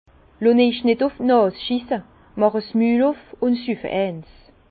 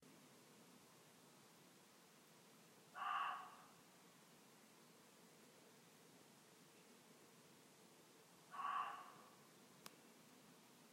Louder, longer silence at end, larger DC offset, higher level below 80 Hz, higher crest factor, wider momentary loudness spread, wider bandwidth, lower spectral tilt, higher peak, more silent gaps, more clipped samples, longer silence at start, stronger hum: first, -20 LUFS vs -52 LUFS; first, 0.5 s vs 0 s; neither; first, -54 dBFS vs under -90 dBFS; second, 16 dB vs 24 dB; second, 10 LU vs 20 LU; second, 4.8 kHz vs 16 kHz; first, -10.5 dB/octave vs -2.5 dB/octave; first, -4 dBFS vs -34 dBFS; neither; neither; first, 0.4 s vs 0 s; neither